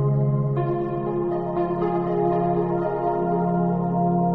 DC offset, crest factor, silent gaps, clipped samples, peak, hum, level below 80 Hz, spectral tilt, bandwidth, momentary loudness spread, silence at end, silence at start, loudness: 0.3%; 12 dB; none; under 0.1%; -10 dBFS; none; -50 dBFS; -12 dB/octave; 4 kHz; 4 LU; 0 s; 0 s; -23 LUFS